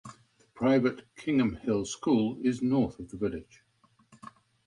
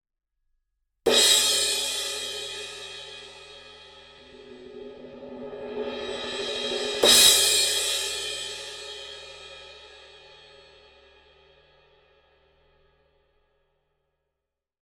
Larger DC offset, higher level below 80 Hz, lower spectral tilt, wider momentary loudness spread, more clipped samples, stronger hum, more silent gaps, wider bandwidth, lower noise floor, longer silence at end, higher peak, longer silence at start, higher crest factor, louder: neither; about the same, -58 dBFS vs -60 dBFS; first, -6.5 dB/octave vs 0.5 dB/octave; second, 9 LU vs 26 LU; neither; neither; neither; second, 10.5 kHz vs 16.5 kHz; second, -67 dBFS vs -85 dBFS; second, 0.35 s vs 4.7 s; second, -14 dBFS vs -4 dBFS; second, 0.05 s vs 1.05 s; second, 16 dB vs 26 dB; second, -29 LUFS vs -21 LUFS